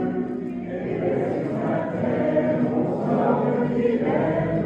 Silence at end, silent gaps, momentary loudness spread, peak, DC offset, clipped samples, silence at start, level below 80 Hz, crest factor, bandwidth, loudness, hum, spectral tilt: 0 s; none; 7 LU; -8 dBFS; under 0.1%; under 0.1%; 0 s; -52 dBFS; 16 dB; 7.4 kHz; -23 LUFS; none; -9.5 dB/octave